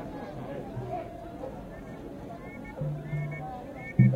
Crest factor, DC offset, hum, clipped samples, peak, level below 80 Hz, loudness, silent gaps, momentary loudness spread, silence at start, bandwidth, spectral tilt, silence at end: 24 dB; under 0.1%; none; under 0.1%; -8 dBFS; -52 dBFS; -36 LUFS; none; 9 LU; 0 s; 6.6 kHz; -9.5 dB/octave; 0 s